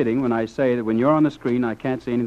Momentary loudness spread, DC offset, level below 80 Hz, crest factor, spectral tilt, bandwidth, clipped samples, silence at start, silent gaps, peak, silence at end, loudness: 6 LU; under 0.1%; -54 dBFS; 14 dB; -8.5 dB/octave; 8.2 kHz; under 0.1%; 0 s; none; -8 dBFS; 0 s; -21 LUFS